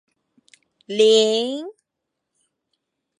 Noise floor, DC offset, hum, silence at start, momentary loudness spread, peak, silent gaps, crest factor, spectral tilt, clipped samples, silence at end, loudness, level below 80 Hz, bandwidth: -81 dBFS; under 0.1%; none; 0.9 s; 17 LU; -4 dBFS; none; 18 dB; -3 dB/octave; under 0.1%; 1.5 s; -18 LUFS; -84 dBFS; 11 kHz